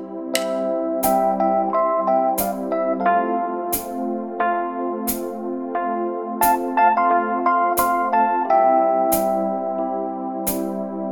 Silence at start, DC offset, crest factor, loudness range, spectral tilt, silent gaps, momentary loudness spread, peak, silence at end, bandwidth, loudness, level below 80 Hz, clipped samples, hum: 0 s; 0.2%; 18 dB; 5 LU; -4.5 dB/octave; none; 9 LU; -2 dBFS; 0 s; 19 kHz; -20 LUFS; -54 dBFS; under 0.1%; none